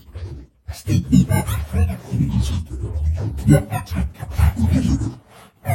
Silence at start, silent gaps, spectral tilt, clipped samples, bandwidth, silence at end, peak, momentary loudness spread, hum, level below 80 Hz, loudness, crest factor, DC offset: 0.1 s; none; -7 dB/octave; under 0.1%; 16 kHz; 0 s; 0 dBFS; 16 LU; none; -26 dBFS; -20 LUFS; 18 dB; under 0.1%